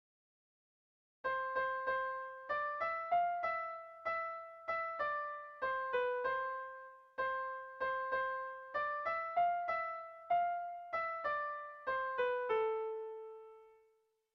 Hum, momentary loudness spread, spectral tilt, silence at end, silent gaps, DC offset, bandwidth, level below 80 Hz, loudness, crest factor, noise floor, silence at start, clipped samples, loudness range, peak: none; 10 LU; -4.5 dB/octave; 0.6 s; none; under 0.1%; 6 kHz; -76 dBFS; -38 LUFS; 14 dB; -76 dBFS; 1.25 s; under 0.1%; 2 LU; -24 dBFS